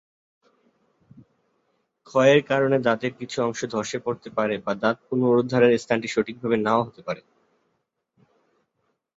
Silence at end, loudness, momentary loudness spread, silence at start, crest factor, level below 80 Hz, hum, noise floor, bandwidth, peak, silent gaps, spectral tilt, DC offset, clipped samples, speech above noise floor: 2 s; -23 LUFS; 11 LU; 2.15 s; 20 dB; -66 dBFS; none; -75 dBFS; 8 kHz; -4 dBFS; none; -5.5 dB/octave; under 0.1%; under 0.1%; 53 dB